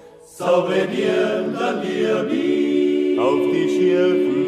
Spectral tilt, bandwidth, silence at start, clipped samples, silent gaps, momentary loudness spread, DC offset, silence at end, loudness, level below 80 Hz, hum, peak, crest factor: -6 dB/octave; 11.5 kHz; 0.05 s; under 0.1%; none; 5 LU; under 0.1%; 0 s; -19 LUFS; -64 dBFS; none; -6 dBFS; 12 dB